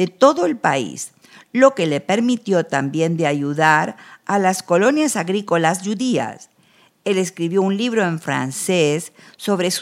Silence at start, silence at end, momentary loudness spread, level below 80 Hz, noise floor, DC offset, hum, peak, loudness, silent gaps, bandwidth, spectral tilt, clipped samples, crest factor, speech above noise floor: 0 s; 0 s; 11 LU; -74 dBFS; -55 dBFS; under 0.1%; none; 0 dBFS; -19 LUFS; none; 16 kHz; -4.5 dB/octave; under 0.1%; 18 dB; 37 dB